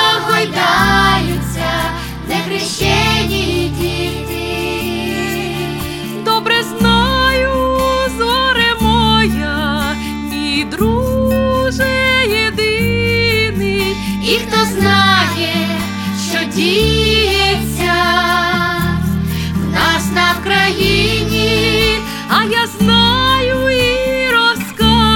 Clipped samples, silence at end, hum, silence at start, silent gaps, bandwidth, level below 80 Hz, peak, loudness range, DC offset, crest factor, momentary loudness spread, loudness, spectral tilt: under 0.1%; 0 s; none; 0 s; none; 19.5 kHz; -28 dBFS; 0 dBFS; 4 LU; under 0.1%; 14 dB; 8 LU; -13 LUFS; -4.5 dB/octave